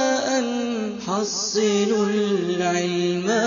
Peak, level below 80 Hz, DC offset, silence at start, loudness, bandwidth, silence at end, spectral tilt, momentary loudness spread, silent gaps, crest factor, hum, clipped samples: -10 dBFS; -64 dBFS; under 0.1%; 0 s; -22 LUFS; 7.4 kHz; 0 s; -4 dB/octave; 5 LU; none; 12 dB; none; under 0.1%